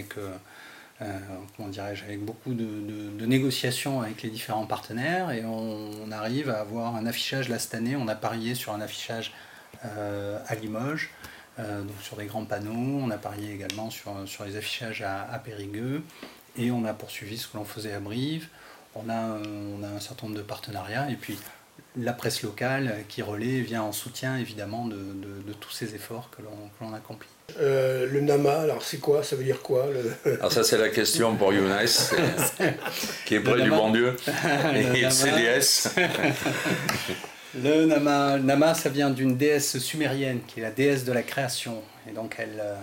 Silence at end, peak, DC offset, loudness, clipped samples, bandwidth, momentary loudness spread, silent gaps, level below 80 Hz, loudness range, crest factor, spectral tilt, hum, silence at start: 0 s; -10 dBFS; under 0.1%; -27 LUFS; under 0.1%; 16.5 kHz; 17 LU; none; -66 dBFS; 12 LU; 18 dB; -4 dB/octave; none; 0 s